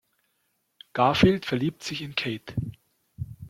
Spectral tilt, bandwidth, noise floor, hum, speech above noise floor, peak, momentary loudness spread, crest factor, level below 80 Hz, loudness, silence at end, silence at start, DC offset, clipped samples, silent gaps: -6 dB/octave; 15 kHz; -74 dBFS; none; 49 dB; -4 dBFS; 19 LU; 24 dB; -50 dBFS; -26 LUFS; 0 s; 0.95 s; under 0.1%; under 0.1%; none